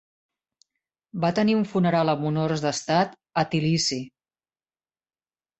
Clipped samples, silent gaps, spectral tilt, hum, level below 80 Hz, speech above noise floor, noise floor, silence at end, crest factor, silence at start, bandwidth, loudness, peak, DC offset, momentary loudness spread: under 0.1%; none; -5.5 dB/octave; none; -62 dBFS; over 67 dB; under -90 dBFS; 1.5 s; 20 dB; 1.15 s; 8.4 kHz; -24 LUFS; -6 dBFS; under 0.1%; 6 LU